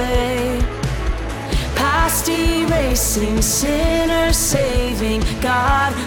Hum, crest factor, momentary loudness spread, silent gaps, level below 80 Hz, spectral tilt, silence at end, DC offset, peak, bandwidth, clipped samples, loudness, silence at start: none; 14 dB; 7 LU; none; -24 dBFS; -4 dB/octave; 0 s; under 0.1%; -4 dBFS; over 20 kHz; under 0.1%; -18 LUFS; 0 s